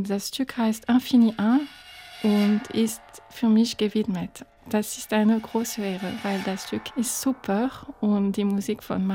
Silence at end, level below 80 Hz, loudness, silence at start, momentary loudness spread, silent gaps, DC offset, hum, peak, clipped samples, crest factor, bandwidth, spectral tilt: 0 s; -60 dBFS; -25 LUFS; 0 s; 10 LU; none; under 0.1%; none; -10 dBFS; under 0.1%; 14 dB; 17 kHz; -5 dB/octave